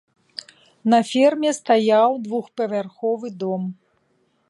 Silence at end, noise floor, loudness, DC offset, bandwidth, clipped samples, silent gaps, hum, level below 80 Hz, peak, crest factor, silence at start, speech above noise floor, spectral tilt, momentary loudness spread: 0.75 s; -65 dBFS; -20 LUFS; under 0.1%; 11.5 kHz; under 0.1%; none; none; -76 dBFS; -4 dBFS; 18 dB; 0.85 s; 46 dB; -5 dB/octave; 18 LU